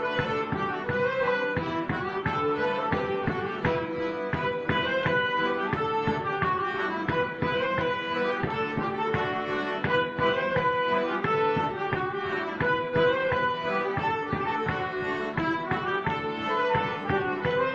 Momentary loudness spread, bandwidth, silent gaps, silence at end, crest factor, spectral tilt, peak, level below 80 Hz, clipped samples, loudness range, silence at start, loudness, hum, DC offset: 4 LU; 7.4 kHz; none; 0 s; 16 dB; -7 dB/octave; -10 dBFS; -50 dBFS; under 0.1%; 2 LU; 0 s; -27 LUFS; none; under 0.1%